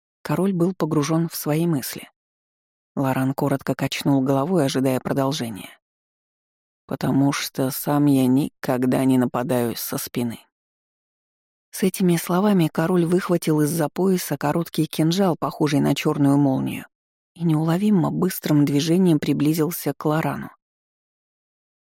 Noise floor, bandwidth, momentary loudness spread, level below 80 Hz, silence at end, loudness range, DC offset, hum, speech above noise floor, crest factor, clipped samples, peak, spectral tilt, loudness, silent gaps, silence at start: under -90 dBFS; 17 kHz; 8 LU; -60 dBFS; 1.4 s; 4 LU; under 0.1%; none; over 69 dB; 14 dB; under 0.1%; -8 dBFS; -6 dB/octave; -21 LUFS; 2.16-2.95 s, 5.82-6.88 s, 10.52-11.72 s, 16.95-17.35 s; 0.25 s